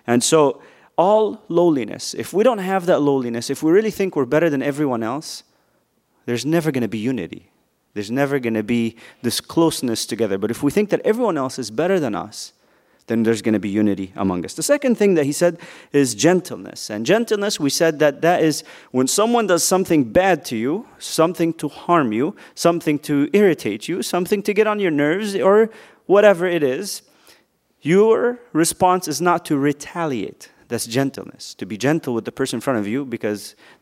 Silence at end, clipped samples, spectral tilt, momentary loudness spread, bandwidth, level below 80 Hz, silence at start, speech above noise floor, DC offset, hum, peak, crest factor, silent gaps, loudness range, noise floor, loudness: 0.3 s; under 0.1%; -4.5 dB/octave; 11 LU; 16 kHz; -58 dBFS; 0.05 s; 45 dB; under 0.1%; none; 0 dBFS; 20 dB; none; 5 LU; -64 dBFS; -19 LUFS